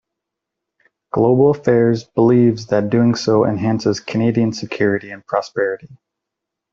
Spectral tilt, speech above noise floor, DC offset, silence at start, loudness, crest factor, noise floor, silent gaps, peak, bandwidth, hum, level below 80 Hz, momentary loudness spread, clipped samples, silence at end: -7 dB/octave; 66 dB; under 0.1%; 1.15 s; -17 LUFS; 14 dB; -81 dBFS; none; -2 dBFS; 7.6 kHz; none; -56 dBFS; 9 LU; under 0.1%; 0.8 s